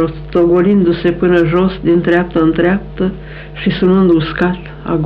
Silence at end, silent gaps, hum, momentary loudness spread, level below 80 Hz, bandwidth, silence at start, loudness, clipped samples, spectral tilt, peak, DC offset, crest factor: 0 s; none; none; 9 LU; -32 dBFS; 5.2 kHz; 0 s; -13 LUFS; under 0.1%; -9.5 dB/octave; -2 dBFS; under 0.1%; 12 dB